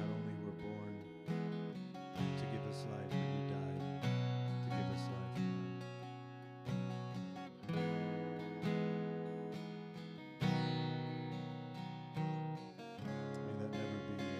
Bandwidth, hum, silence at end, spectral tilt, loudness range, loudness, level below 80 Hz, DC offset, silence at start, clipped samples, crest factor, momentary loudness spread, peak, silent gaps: 11.5 kHz; none; 0 s; -7.5 dB/octave; 3 LU; -42 LUFS; -76 dBFS; under 0.1%; 0 s; under 0.1%; 16 dB; 10 LU; -24 dBFS; none